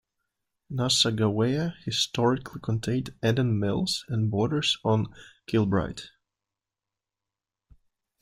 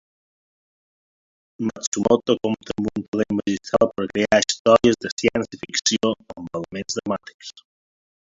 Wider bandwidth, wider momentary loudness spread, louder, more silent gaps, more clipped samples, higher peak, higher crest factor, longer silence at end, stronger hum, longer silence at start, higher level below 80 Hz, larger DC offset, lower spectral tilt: first, 15.5 kHz vs 8 kHz; second, 8 LU vs 13 LU; second, -26 LUFS vs -22 LUFS; second, none vs 1.87-1.92 s, 3.08-3.12 s, 4.59-4.65 s, 5.12-5.17 s, 7.34-7.39 s; neither; second, -8 dBFS vs -2 dBFS; about the same, 20 dB vs 22 dB; first, 2.15 s vs 0.85 s; neither; second, 0.7 s vs 1.6 s; about the same, -56 dBFS vs -54 dBFS; neither; about the same, -5 dB/octave vs -4 dB/octave